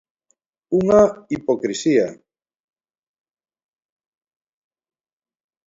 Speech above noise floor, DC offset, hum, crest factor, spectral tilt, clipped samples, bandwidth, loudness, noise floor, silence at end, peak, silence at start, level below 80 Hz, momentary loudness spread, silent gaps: 52 dB; under 0.1%; none; 22 dB; -6 dB/octave; under 0.1%; 8 kHz; -19 LUFS; -69 dBFS; 3.55 s; -2 dBFS; 0.7 s; -56 dBFS; 10 LU; none